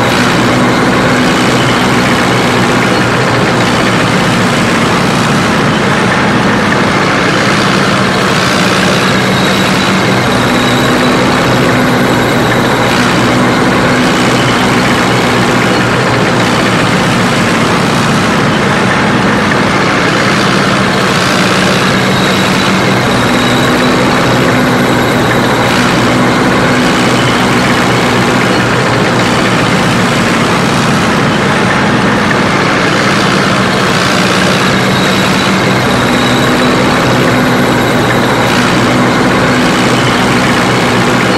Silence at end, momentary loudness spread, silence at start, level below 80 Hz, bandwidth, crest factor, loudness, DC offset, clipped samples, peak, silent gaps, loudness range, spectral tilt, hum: 0 s; 1 LU; 0 s; -32 dBFS; 16 kHz; 8 dB; -8 LUFS; under 0.1%; under 0.1%; 0 dBFS; none; 0 LU; -4.5 dB/octave; none